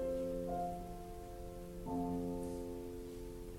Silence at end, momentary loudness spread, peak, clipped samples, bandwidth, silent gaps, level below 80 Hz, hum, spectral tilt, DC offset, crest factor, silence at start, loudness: 0 s; 10 LU; -28 dBFS; under 0.1%; 16.5 kHz; none; -52 dBFS; none; -7.5 dB/octave; under 0.1%; 14 dB; 0 s; -44 LUFS